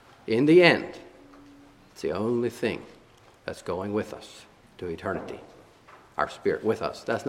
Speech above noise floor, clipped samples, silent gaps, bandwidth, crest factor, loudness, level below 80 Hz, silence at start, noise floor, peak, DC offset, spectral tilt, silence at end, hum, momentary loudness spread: 30 dB; under 0.1%; none; 13 kHz; 26 dB; -26 LUFS; -60 dBFS; 0.25 s; -55 dBFS; -2 dBFS; under 0.1%; -6 dB/octave; 0 s; none; 22 LU